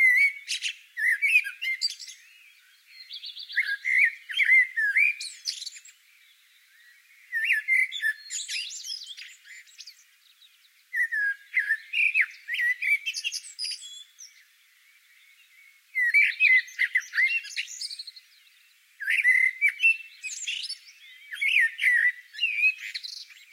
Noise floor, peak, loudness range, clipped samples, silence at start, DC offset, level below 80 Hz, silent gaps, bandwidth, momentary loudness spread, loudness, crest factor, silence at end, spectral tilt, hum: -60 dBFS; -10 dBFS; 6 LU; under 0.1%; 0 s; under 0.1%; under -90 dBFS; none; 16 kHz; 19 LU; -24 LUFS; 18 dB; 0.2 s; 12.5 dB/octave; none